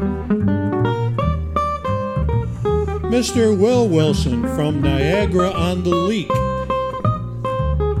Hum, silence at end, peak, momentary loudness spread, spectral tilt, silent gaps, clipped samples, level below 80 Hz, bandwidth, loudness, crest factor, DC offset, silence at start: none; 0 s; -4 dBFS; 6 LU; -6.5 dB/octave; none; under 0.1%; -28 dBFS; 13.5 kHz; -19 LUFS; 14 dB; under 0.1%; 0 s